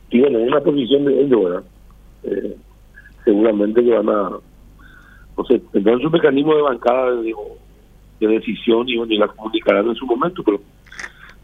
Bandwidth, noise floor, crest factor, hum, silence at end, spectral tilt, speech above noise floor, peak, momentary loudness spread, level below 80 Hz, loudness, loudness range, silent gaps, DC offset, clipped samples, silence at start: 7 kHz; -46 dBFS; 16 dB; none; 0.35 s; -7 dB/octave; 30 dB; 0 dBFS; 17 LU; -48 dBFS; -17 LUFS; 2 LU; none; under 0.1%; under 0.1%; 0.1 s